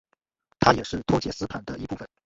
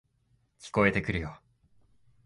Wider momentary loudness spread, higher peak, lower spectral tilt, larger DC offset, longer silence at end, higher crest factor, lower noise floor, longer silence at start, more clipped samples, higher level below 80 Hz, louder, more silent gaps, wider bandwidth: second, 13 LU vs 17 LU; first, -2 dBFS vs -8 dBFS; about the same, -5.5 dB/octave vs -6.5 dB/octave; neither; second, 0.2 s vs 0.9 s; about the same, 24 dB vs 24 dB; about the same, -70 dBFS vs -71 dBFS; about the same, 0.6 s vs 0.6 s; neither; about the same, -48 dBFS vs -50 dBFS; first, -25 LUFS vs -28 LUFS; neither; second, 8 kHz vs 11.5 kHz